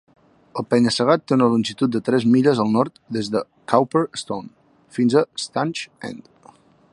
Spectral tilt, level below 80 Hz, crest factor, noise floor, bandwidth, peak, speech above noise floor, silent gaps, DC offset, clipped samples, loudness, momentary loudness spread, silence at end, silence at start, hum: -6 dB/octave; -64 dBFS; 20 dB; -51 dBFS; 11 kHz; -2 dBFS; 31 dB; none; under 0.1%; under 0.1%; -20 LUFS; 15 LU; 0.75 s; 0.55 s; none